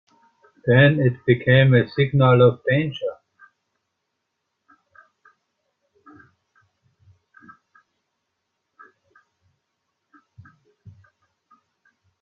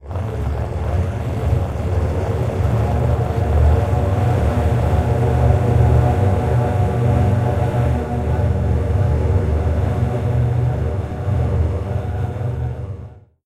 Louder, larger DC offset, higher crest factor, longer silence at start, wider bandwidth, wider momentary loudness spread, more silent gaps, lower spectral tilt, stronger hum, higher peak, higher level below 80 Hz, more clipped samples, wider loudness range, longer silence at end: about the same, -18 LUFS vs -19 LUFS; neither; about the same, 20 dB vs 16 dB; first, 0.65 s vs 0 s; second, 4.8 kHz vs 10.5 kHz; first, 13 LU vs 7 LU; neither; first, -10 dB/octave vs -8.5 dB/octave; neither; about the same, -2 dBFS vs -2 dBFS; second, -58 dBFS vs -26 dBFS; neither; first, 13 LU vs 4 LU; first, 9.1 s vs 0.25 s